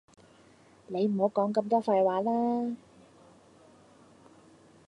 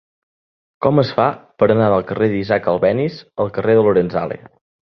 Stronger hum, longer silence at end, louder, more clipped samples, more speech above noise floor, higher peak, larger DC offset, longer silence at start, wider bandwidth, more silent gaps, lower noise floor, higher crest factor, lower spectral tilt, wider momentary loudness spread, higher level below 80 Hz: neither; first, 2.1 s vs 0.5 s; second, -28 LUFS vs -17 LUFS; neither; second, 31 dB vs over 74 dB; second, -12 dBFS vs -2 dBFS; neither; about the same, 0.9 s vs 0.8 s; first, 10 kHz vs 6 kHz; neither; second, -59 dBFS vs under -90 dBFS; about the same, 18 dB vs 16 dB; about the same, -8 dB/octave vs -9 dB/octave; about the same, 10 LU vs 10 LU; second, -78 dBFS vs -50 dBFS